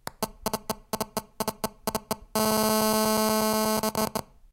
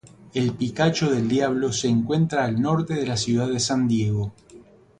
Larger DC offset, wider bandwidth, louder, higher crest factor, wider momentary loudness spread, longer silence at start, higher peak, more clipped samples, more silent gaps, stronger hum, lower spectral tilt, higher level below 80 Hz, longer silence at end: neither; first, 16.5 kHz vs 10.5 kHz; second, -27 LUFS vs -23 LUFS; about the same, 20 dB vs 16 dB; first, 10 LU vs 4 LU; about the same, 0.05 s vs 0.05 s; about the same, -8 dBFS vs -6 dBFS; neither; neither; neither; second, -3 dB/octave vs -5.5 dB/octave; about the same, -52 dBFS vs -52 dBFS; about the same, 0.3 s vs 0.4 s